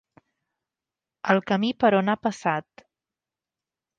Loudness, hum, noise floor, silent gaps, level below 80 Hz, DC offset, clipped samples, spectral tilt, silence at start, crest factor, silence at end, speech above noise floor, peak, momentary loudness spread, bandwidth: -24 LUFS; none; -90 dBFS; none; -68 dBFS; under 0.1%; under 0.1%; -6 dB/octave; 1.25 s; 24 dB; 1.35 s; 67 dB; -2 dBFS; 8 LU; 9 kHz